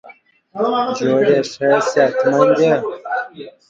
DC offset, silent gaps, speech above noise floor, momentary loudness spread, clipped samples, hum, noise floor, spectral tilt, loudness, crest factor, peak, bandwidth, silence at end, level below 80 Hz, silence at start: under 0.1%; none; 30 dB; 11 LU; under 0.1%; none; -45 dBFS; -5.5 dB/octave; -16 LUFS; 16 dB; 0 dBFS; 7.8 kHz; 0.2 s; -64 dBFS; 0.05 s